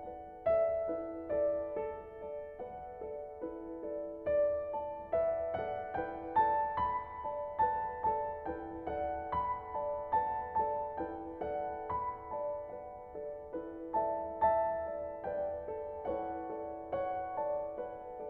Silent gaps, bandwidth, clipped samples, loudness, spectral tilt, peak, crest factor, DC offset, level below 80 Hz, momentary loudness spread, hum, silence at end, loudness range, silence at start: none; 4.3 kHz; under 0.1%; -37 LUFS; -5.5 dB/octave; -18 dBFS; 18 dB; under 0.1%; -60 dBFS; 12 LU; none; 0 s; 4 LU; 0 s